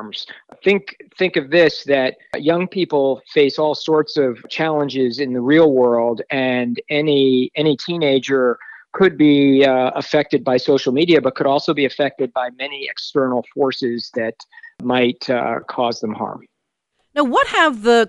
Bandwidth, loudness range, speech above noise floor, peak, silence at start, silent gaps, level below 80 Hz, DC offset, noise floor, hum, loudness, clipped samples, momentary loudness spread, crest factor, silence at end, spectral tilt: 10.5 kHz; 6 LU; 55 dB; -2 dBFS; 0 s; none; -62 dBFS; under 0.1%; -72 dBFS; none; -17 LUFS; under 0.1%; 11 LU; 14 dB; 0 s; -6 dB/octave